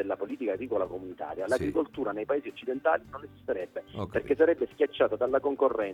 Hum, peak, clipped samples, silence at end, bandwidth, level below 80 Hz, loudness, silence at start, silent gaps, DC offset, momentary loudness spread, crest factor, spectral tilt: none; -12 dBFS; under 0.1%; 0 s; 12.5 kHz; -58 dBFS; -30 LUFS; 0 s; none; under 0.1%; 11 LU; 18 dB; -6.5 dB/octave